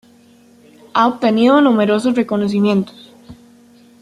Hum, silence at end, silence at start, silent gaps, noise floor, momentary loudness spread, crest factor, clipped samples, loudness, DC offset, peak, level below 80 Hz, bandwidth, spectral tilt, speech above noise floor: none; 0.7 s; 0.95 s; none; -48 dBFS; 8 LU; 14 dB; under 0.1%; -15 LUFS; under 0.1%; -2 dBFS; -60 dBFS; 11.5 kHz; -6.5 dB/octave; 34 dB